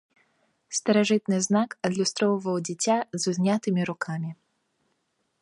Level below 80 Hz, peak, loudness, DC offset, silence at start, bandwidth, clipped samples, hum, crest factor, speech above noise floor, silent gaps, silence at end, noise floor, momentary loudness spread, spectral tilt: -72 dBFS; -8 dBFS; -26 LUFS; under 0.1%; 0.7 s; 11.5 kHz; under 0.1%; none; 18 dB; 49 dB; none; 1.1 s; -74 dBFS; 9 LU; -4.5 dB/octave